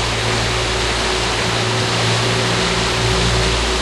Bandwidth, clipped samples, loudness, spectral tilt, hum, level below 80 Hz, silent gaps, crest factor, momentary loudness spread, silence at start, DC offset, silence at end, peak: 12.5 kHz; under 0.1%; -16 LUFS; -3.5 dB/octave; none; -28 dBFS; none; 14 dB; 2 LU; 0 s; under 0.1%; 0 s; -4 dBFS